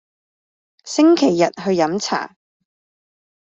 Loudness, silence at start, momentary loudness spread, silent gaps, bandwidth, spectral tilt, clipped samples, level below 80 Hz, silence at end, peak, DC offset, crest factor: -17 LUFS; 0.85 s; 11 LU; none; 8 kHz; -4.5 dB/octave; under 0.1%; -66 dBFS; 1.2 s; -2 dBFS; under 0.1%; 18 dB